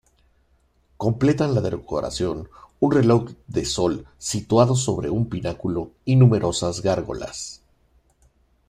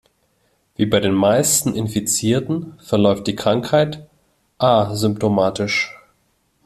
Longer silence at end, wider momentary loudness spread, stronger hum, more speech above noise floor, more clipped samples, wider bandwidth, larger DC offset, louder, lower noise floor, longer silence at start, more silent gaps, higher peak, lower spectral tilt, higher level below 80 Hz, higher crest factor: first, 1.15 s vs 0.7 s; first, 13 LU vs 8 LU; neither; second, 41 dB vs 46 dB; neither; second, 12 kHz vs 14 kHz; neither; second, -22 LUFS vs -18 LUFS; about the same, -62 dBFS vs -64 dBFS; first, 1 s vs 0.8 s; neither; about the same, -2 dBFS vs 0 dBFS; first, -6 dB/octave vs -4.5 dB/octave; first, -46 dBFS vs -52 dBFS; about the same, 20 dB vs 18 dB